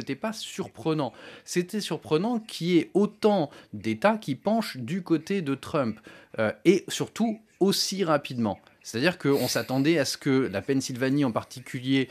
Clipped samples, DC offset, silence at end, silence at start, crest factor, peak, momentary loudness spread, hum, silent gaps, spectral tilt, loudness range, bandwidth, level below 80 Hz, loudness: under 0.1%; under 0.1%; 0.05 s; 0 s; 20 dB; -6 dBFS; 10 LU; none; none; -5 dB/octave; 2 LU; 15 kHz; -72 dBFS; -27 LUFS